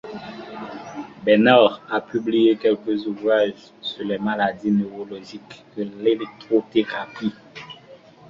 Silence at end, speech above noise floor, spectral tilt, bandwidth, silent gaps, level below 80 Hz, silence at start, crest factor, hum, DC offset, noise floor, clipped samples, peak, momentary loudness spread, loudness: 0.35 s; 26 dB; -7 dB/octave; 7.2 kHz; none; -64 dBFS; 0.05 s; 20 dB; none; under 0.1%; -47 dBFS; under 0.1%; -2 dBFS; 20 LU; -21 LUFS